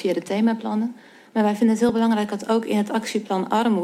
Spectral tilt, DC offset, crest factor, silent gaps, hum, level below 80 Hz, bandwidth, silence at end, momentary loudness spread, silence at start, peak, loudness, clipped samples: -6 dB/octave; under 0.1%; 14 dB; none; none; -66 dBFS; 13.5 kHz; 0 s; 6 LU; 0 s; -8 dBFS; -22 LUFS; under 0.1%